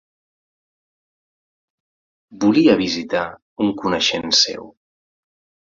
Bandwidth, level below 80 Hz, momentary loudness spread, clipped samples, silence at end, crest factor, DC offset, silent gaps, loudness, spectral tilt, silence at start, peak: 7.6 kHz; -56 dBFS; 9 LU; under 0.1%; 1.05 s; 20 dB; under 0.1%; 3.42-3.56 s; -17 LUFS; -3.5 dB/octave; 2.3 s; -2 dBFS